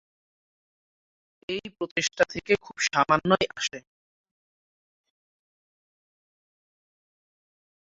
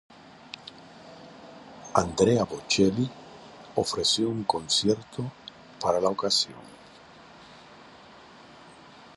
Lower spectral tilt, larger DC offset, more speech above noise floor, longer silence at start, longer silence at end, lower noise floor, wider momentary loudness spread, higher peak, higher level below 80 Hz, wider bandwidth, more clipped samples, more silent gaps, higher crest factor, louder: about the same, -3 dB/octave vs -4 dB/octave; neither; first, over 64 dB vs 25 dB; first, 1.5 s vs 0.6 s; first, 4.05 s vs 0.45 s; first, under -90 dBFS vs -50 dBFS; second, 12 LU vs 24 LU; about the same, -6 dBFS vs -4 dBFS; second, -64 dBFS vs -58 dBFS; second, 8 kHz vs 11.5 kHz; neither; first, 1.91-1.96 s vs none; about the same, 26 dB vs 26 dB; about the same, -26 LUFS vs -26 LUFS